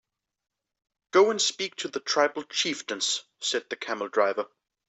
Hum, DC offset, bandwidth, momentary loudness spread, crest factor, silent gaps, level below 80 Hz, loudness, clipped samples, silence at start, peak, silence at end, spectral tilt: none; under 0.1%; 8.4 kHz; 10 LU; 20 dB; none; -80 dBFS; -26 LUFS; under 0.1%; 1.15 s; -8 dBFS; 0.4 s; -1 dB/octave